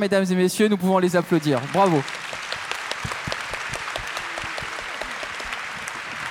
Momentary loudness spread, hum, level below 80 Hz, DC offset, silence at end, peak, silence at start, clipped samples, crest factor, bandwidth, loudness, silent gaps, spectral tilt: 10 LU; none; -52 dBFS; under 0.1%; 0 s; -4 dBFS; 0 s; under 0.1%; 20 dB; 17 kHz; -24 LUFS; none; -5 dB/octave